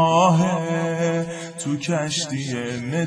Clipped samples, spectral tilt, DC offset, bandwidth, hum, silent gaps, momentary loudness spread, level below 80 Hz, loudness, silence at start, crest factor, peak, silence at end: under 0.1%; -5 dB/octave; under 0.1%; 10.5 kHz; none; none; 10 LU; -60 dBFS; -22 LUFS; 0 s; 16 dB; -4 dBFS; 0 s